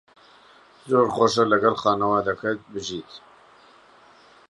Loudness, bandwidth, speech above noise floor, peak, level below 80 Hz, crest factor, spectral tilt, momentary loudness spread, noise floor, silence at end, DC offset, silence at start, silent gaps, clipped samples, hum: -22 LUFS; 11.5 kHz; 31 dB; -4 dBFS; -60 dBFS; 20 dB; -5 dB/octave; 13 LU; -53 dBFS; 1.3 s; under 0.1%; 0.85 s; none; under 0.1%; none